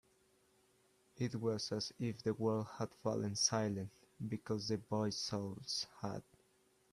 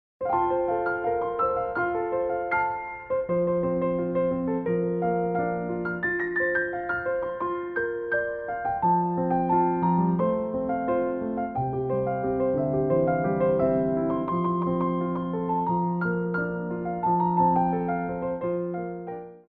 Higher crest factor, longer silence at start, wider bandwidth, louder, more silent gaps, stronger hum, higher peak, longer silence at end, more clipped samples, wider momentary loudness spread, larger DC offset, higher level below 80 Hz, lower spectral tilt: first, 22 dB vs 14 dB; first, 1.15 s vs 0.2 s; first, 14 kHz vs 4.2 kHz; second, -40 LUFS vs -26 LUFS; neither; neither; second, -18 dBFS vs -12 dBFS; first, 0.7 s vs 0.1 s; neither; first, 11 LU vs 6 LU; neither; second, -74 dBFS vs -54 dBFS; second, -4.5 dB/octave vs -12 dB/octave